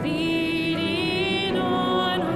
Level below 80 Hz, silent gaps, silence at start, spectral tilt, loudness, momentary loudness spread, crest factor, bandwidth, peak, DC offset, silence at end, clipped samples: -50 dBFS; none; 0 s; -5.5 dB/octave; -23 LUFS; 1 LU; 12 dB; 15 kHz; -12 dBFS; under 0.1%; 0 s; under 0.1%